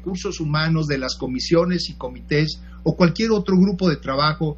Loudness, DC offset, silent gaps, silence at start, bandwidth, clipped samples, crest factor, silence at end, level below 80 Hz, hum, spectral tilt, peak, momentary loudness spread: -21 LUFS; under 0.1%; none; 0 s; 8 kHz; under 0.1%; 18 dB; 0 s; -40 dBFS; none; -6 dB/octave; -2 dBFS; 8 LU